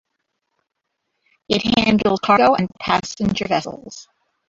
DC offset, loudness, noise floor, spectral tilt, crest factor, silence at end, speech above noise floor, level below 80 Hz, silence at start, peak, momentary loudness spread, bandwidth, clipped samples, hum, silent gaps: under 0.1%; -18 LUFS; -76 dBFS; -5 dB/octave; 18 dB; 0.45 s; 58 dB; -48 dBFS; 1.5 s; -2 dBFS; 19 LU; 7.8 kHz; under 0.1%; none; none